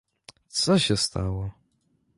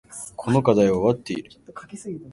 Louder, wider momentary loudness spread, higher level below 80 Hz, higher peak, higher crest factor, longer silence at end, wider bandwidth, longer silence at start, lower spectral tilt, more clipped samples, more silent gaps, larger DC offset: second, -25 LUFS vs -21 LUFS; second, 12 LU vs 21 LU; first, -44 dBFS vs -54 dBFS; second, -8 dBFS vs -2 dBFS; about the same, 18 dB vs 20 dB; first, 0.65 s vs 0 s; about the same, 11.5 kHz vs 11.5 kHz; first, 0.55 s vs 0.1 s; second, -4.5 dB/octave vs -6.5 dB/octave; neither; neither; neither